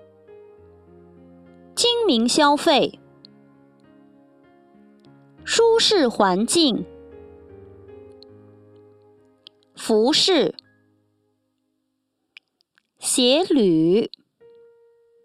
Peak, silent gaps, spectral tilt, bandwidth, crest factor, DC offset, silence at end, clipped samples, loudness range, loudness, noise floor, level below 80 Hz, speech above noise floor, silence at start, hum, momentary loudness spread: -4 dBFS; none; -3 dB/octave; 14.5 kHz; 20 dB; under 0.1%; 1.15 s; under 0.1%; 5 LU; -18 LUFS; -75 dBFS; -60 dBFS; 57 dB; 1.75 s; none; 14 LU